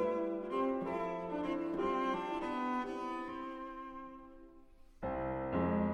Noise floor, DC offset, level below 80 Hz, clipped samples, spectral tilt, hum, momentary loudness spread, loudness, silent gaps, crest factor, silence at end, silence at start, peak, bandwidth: -58 dBFS; under 0.1%; -60 dBFS; under 0.1%; -7.5 dB/octave; none; 12 LU; -38 LUFS; none; 14 dB; 0 s; 0 s; -22 dBFS; 10.5 kHz